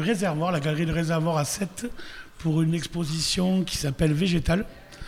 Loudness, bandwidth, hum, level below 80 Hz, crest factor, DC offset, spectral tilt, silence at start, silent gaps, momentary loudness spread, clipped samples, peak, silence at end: -25 LUFS; 15.5 kHz; none; -42 dBFS; 16 dB; under 0.1%; -5 dB/octave; 0 s; none; 10 LU; under 0.1%; -10 dBFS; 0 s